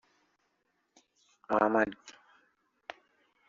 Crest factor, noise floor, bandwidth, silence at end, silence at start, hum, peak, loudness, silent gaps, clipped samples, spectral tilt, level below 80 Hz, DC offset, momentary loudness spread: 26 dB; -78 dBFS; 7.6 kHz; 1.4 s; 1.5 s; none; -10 dBFS; -29 LUFS; none; under 0.1%; -4 dB/octave; -74 dBFS; under 0.1%; 23 LU